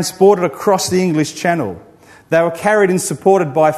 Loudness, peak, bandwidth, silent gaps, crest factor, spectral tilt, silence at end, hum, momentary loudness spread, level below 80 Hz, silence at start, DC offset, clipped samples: -14 LUFS; 0 dBFS; 13.5 kHz; none; 14 dB; -5 dB/octave; 0 s; none; 6 LU; -56 dBFS; 0 s; under 0.1%; under 0.1%